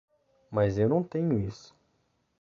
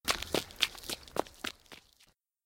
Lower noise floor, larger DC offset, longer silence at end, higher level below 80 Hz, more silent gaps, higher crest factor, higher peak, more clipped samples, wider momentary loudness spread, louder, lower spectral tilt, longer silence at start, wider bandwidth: first, -73 dBFS vs -68 dBFS; neither; first, 0.85 s vs 0.65 s; about the same, -54 dBFS vs -58 dBFS; neither; second, 18 dB vs 34 dB; second, -12 dBFS vs -6 dBFS; neither; second, 11 LU vs 21 LU; first, -28 LUFS vs -35 LUFS; first, -9 dB/octave vs -1.5 dB/octave; first, 0.5 s vs 0.05 s; second, 7.2 kHz vs 17 kHz